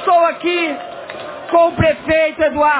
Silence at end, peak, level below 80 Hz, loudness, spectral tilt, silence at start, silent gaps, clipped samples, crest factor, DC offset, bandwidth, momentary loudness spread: 0 s; -2 dBFS; -40 dBFS; -15 LUFS; -9.5 dB/octave; 0 s; none; under 0.1%; 14 dB; under 0.1%; 4 kHz; 15 LU